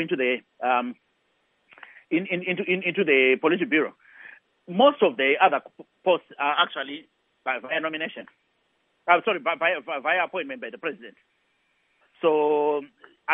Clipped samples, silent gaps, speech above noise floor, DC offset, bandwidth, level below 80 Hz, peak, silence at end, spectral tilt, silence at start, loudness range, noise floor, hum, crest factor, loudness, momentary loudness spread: under 0.1%; none; 46 dB; under 0.1%; 3.9 kHz; -84 dBFS; -4 dBFS; 0 s; -8 dB/octave; 0 s; 5 LU; -70 dBFS; none; 22 dB; -24 LUFS; 14 LU